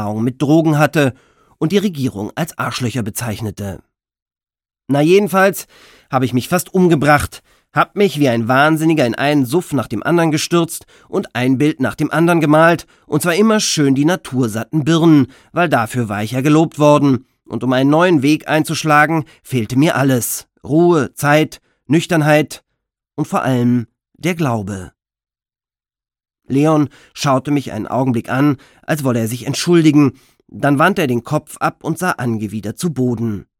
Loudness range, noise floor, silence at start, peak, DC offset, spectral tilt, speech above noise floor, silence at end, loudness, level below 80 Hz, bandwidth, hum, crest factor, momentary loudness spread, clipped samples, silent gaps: 6 LU; under -90 dBFS; 0 s; 0 dBFS; under 0.1%; -5.5 dB/octave; over 75 dB; 0.15 s; -15 LUFS; -50 dBFS; 17.5 kHz; none; 16 dB; 10 LU; under 0.1%; 4.22-4.26 s